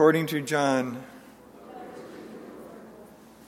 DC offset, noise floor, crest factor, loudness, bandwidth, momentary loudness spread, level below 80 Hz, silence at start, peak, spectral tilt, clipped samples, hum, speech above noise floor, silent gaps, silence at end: under 0.1%; -50 dBFS; 22 dB; -26 LUFS; 16.5 kHz; 24 LU; -70 dBFS; 0 s; -6 dBFS; -5.5 dB/octave; under 0.1%; none; 26 dB; none; 0.45 s